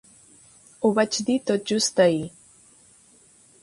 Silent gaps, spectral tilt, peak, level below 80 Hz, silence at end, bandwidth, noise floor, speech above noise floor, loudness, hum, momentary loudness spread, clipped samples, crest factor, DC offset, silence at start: none; -4 dB/octave; -6 dBFS; -66 dBFS; 1.35 s; 11.5 kHz; -55 dBFS; 34 dB; -22 LUFS; none; 7 LU; under 0.1%; 20 dB; under 0.1%; 0.8 s